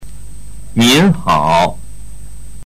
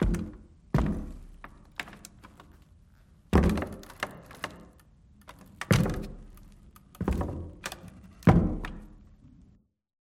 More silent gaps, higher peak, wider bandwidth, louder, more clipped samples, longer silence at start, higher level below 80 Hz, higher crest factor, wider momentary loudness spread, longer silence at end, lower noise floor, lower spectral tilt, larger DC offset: neither; about the same, -4 dBFS vs -6 dBFS; about the same, 16 kHz vs 16.5 kHz; first, -12 LUFS vs -30 LUFS; neither; about the same, 0 s vs 0 s; about the same, -34 dBFS vs -38 dBFS; second, 12 dB vs 26 dB; second, 12 LU vs 25 LU; second, 0 s vs 1.15 s; second, -33 dBFS vs -62 dBFS; second, -4.5 dB/octave vs -6.5 dB/octave; first, 6% vs under 0.1%